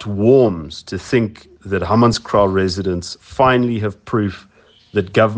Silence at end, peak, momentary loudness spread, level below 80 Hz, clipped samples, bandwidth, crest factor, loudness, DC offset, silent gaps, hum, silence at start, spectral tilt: 0 s; 0 dBFS; 13 LU; -46 dBFS; under 0.1%; 9.6 kHz; 16 dB; -17 LUFS; under 0.1%; none; none; 0 s; -6.5 dB/octave